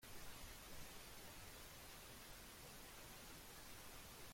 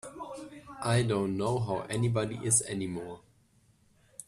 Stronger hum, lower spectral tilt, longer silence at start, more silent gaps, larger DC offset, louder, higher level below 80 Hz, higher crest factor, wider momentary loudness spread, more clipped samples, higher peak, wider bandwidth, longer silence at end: neither; second, -2.5 dB/octave vs -4.5 dB/octave; about the same, 0 s vs 0.05 s; neither; neither; second, -57 LUFS vs -30 LUFS; second, -66 dBFS vs -60 dBFS; second, 16 dB vs 22 dB; second, 1 LU vs 19 LU; neither; second, -42 dBFS vs -10 dBFS; first, 16.5 kHz vs 14.5 kHz; about the same, 0 s vs 0.05 s